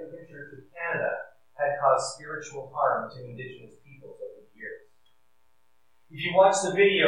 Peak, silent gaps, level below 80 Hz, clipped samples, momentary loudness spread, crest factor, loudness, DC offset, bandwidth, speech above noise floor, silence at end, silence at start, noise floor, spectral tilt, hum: -8 dBFS; none; -76 dBFS; under 0.1%; 23 LU; 20 dB; -26 LUFS; 0.1%; 11 kHz; 46 dB; 0 s; 0 s; -72 dBFS; -3.5 dB/octave; none